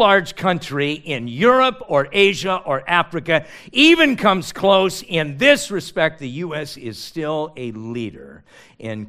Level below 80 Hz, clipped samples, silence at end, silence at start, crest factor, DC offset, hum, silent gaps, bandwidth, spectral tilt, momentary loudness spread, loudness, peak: -52 dBFS; under 0.1%; 0 s; 0 s; 18 dB; under 0.1%; none; none; 15.5 kHz; -4.5 dB/octave; 15 LU; -18 LUFS; 0 dBFS